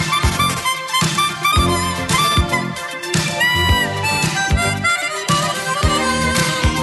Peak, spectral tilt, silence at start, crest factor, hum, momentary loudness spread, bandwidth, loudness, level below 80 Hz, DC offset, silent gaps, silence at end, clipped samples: -2 dBFS; -3.5 dB/octave; 0 s; 14 dB; none; 4 LU; 12.5 kHz; -16 LUFS; -28 dBFS; under 0.1%; none; 0 s; under 0.1%